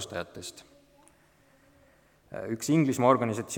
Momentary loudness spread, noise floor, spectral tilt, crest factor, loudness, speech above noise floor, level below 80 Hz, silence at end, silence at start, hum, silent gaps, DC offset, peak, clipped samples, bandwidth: 19 LU; -62 dBFS; -5.5 dB/octave; 22 dB; -27 LUFS; 35 dB; -68 dBFS; 0 s; 0 s; none; none; under 0.1%; -8 dBFS; under 0.1%; 19 kHz